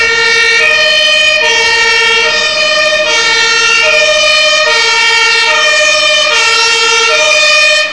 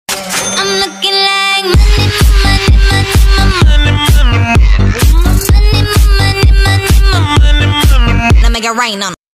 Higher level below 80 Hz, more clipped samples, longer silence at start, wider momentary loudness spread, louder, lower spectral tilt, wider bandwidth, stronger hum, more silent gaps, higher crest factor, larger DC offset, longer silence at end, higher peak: second, -44 dBFS vs -10 dBFS; neither; about the same, 0 s vs 0.1 s; about the same, 2 LU vs 3 LU; first, -6 LUFS vs -9 LUFS; second, 1.5 dB/octave vs -4.5 dB/octave; second, 11 kHz vs 15.5 kHz; neither; neither; about the same, 8 dB vs 8 dB; first, 0.9% vs under 0.1%; second, 0 s vs 0.25 s; about the same, 0 dBFS vs 0 dBFS